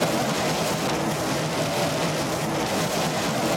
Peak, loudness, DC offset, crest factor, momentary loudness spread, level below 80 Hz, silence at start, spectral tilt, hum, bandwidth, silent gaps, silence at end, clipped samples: -10 dBFS; -24 LUFS; under 0.1%; 14 dB; 1 LU; -52 dBFS; 0 s; -4 dB/octave; none; 17 kHz; none; 0 s; under 0.1%